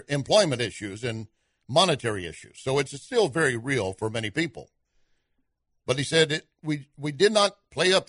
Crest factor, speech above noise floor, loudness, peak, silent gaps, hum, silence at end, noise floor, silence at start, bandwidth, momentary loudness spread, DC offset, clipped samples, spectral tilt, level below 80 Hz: 20 dB; 49 dB; -25 LUFS; -6 dBFS; none; none; 0.05 s; -74 dBFS; 0.1 s; 11 kHz; 12 LU; under 0.1%; under 0.1%; -4 dB/octave; -60 dBFS